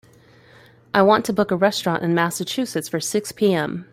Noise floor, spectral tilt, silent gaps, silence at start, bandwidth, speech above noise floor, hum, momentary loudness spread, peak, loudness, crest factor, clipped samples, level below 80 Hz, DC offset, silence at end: -51 dBFS; -4.5 dB/octave; none; 0.95 s; 16.5 kHz; 31 dB; none; 8 LU; -2 dBFS; -20 LUFS; 18 dB; under 0.1%; -62 dBFS; under 0.1%; 0.1 s